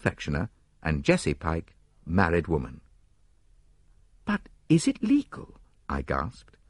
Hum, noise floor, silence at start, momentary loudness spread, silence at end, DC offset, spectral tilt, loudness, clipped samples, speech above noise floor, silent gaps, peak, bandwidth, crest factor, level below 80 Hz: none; -63 dBFS; 0.05 s; 15 LU; 0.4 s; under 0.1%; -6 dB/octave; -28 LUFS; under 0.1%; 36 dB; none; -6 dBFS; 11.5 kHz; 24 dB; -44 dBFS